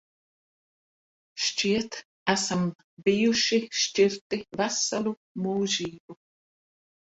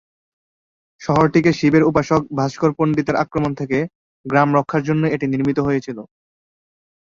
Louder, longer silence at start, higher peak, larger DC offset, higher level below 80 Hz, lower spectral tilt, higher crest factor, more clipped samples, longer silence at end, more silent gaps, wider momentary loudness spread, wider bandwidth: second, -26 LUFS vs -18 LUFS; first, 1.35 s vs 1 s; second, -10 dBFS vs -2 dBFS; neither; second, -66 dBFS vs -50 dBFS; second, -3.5 dB/octave vs -7.5 dB/octave; about the same, 18 dB vs 18 dB; neither; about the same, 1.05 s vs 1.15 s; first, 2.05-2.26 s, 2.75-2.97 s, 4.21-4.30 s, 5.17-5.35 s, 6.00-6.08 s vs 3.95-4.24 s; about the same, 10 LU vs 8 LU; first, 8.2 kHz vs 7.4 kHz